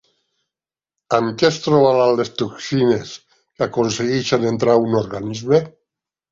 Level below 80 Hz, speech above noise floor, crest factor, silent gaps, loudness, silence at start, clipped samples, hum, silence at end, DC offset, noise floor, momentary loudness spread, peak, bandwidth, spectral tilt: -56 dBFS; 73 dB; 18 dB; none; -18 LUFS; 1.1 s; under 0.1%; none; 0.6 s; under 0.1%; -90 dBFS; 11 LU; -2 dBFS; 7.8 kHz; -5.5 dB/octave